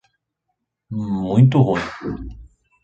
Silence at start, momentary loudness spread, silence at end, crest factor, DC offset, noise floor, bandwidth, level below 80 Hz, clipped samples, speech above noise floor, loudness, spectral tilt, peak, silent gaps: 0.9 s; 18 LU; 0.4 s; 18 dB; under 0.1%; -76 dBFS; 7.6 kHz; -44 dBFS; under 0.1%; 58 dB; -19 LUFS; -9 dB/octave; -2 dBFS; none